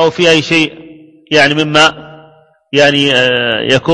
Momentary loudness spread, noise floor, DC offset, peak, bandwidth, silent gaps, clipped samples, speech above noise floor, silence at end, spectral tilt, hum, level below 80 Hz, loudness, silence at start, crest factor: 4 LU; -44 dBFS; 0.3%; 0 dBFS; 11 kHz; none; 0.4%; 34 dB; 0 s; -4 dB/octave; none; -50 dBFS; -10 LUFS; 0 s; 12 dB